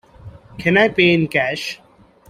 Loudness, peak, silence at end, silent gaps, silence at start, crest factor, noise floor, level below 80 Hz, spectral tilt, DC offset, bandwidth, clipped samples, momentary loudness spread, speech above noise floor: -16 LUFS; -2 dBFS; 0.55 s; none; 0.25 s; 18 dB; -40 dBFS; -52 dBFS; -5.5 dB/octave; under 0.1%; 15.5 kHz; under 0.1%; 14 LU; 24 dB